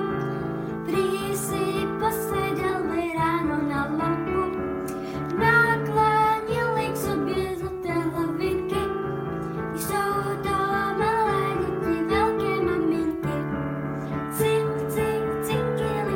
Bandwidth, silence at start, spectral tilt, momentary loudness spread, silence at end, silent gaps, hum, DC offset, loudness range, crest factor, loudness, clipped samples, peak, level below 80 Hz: 17 kHz; 0 s; -6 dB/octave; 8 LU; 0 s; none; none; under 0.1%; 4 LU; 18 dB; -25 LUFS; under 0.1%; -8 dBFS; -46 dBFS